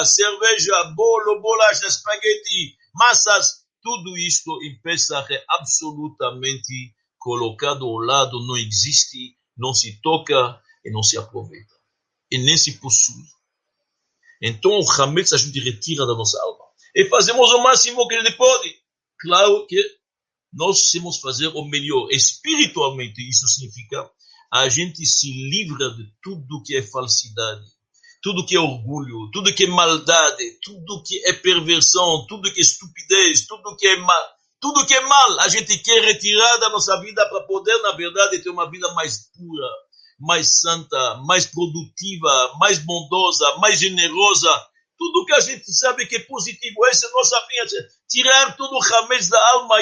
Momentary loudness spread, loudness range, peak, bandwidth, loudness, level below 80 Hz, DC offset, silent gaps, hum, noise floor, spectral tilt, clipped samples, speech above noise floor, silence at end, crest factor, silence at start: 16 LU; 7 LU; 0 dBFS; 11 kHz; -16 LUFS; -64 dBFS; under 0.1%; none; none; -88 dBFS; -1 dB/octave; under 0.1%; 70 dB; 0 s; 18 dB; 0 s